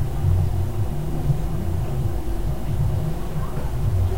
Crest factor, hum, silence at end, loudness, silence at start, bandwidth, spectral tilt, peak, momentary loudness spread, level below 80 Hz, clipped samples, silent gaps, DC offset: 14 dB; none; 0 s; -25 LUFS; 0 s; 16 kHz; -8 dB/octave; -8 dBFS; 6 LU; -28 dBFS; under 0.1%; none; 4%